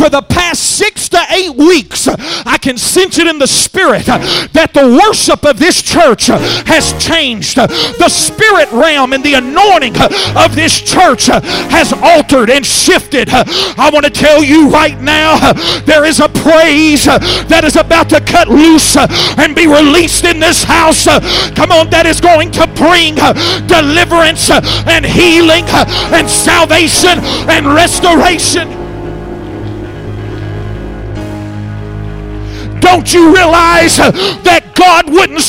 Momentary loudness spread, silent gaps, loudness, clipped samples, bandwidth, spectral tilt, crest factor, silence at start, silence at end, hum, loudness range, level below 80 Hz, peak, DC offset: 15 LU; none; -6 LUFS; 3%; 16.5 kHz; -3 dB/octave; 8 dB; 0 s; 0 s; none; 4 LU; -28 dBFS; 0 dBFS; under 0.1%